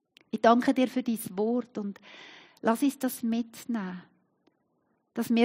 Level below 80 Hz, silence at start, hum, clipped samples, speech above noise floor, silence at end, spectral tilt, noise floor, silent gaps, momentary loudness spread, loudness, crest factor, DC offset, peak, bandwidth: -80 dBFS; 0.35 s; none; under 0.1%; 46 dB; 0 s; -5 dB/octave; -74 dBFS; none; 21 LU; -29 LUFS; 22 dB; under 0.1%; -8 dBFS; 16 kHz